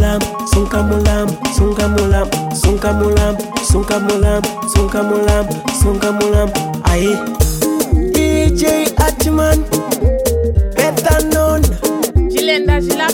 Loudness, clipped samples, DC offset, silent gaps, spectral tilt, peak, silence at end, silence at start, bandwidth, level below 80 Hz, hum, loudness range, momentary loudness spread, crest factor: -14 LUFS; under 0.1%; under 0.1%; none; -5 dB/octave; -2 dBFS; 0 s; 0 s; 17.5 kHz; -18 dBFS; none; 1 LU; 4 LU; 12 dB